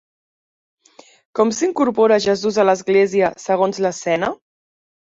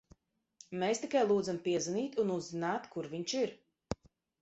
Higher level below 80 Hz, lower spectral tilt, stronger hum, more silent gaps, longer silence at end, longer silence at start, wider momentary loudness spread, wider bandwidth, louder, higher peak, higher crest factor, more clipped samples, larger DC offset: first, -60 dBFS vs -66 dBFS; about the same, -4.5 dB/octave vs -4.5 dB/octave; neither; neither; first, 0.8 s vs 0.5 s; first, 1.35 s vs 0.7 s; second, 7 LU vs 14 LU; about the same, 7.8 kHz vs 8.4 kHz; first, -17 LUFS vs -35 LUFS; first, -2 dBFS vs -18 dBFS; about the same, 16 dB vs 18 dB; neither; neither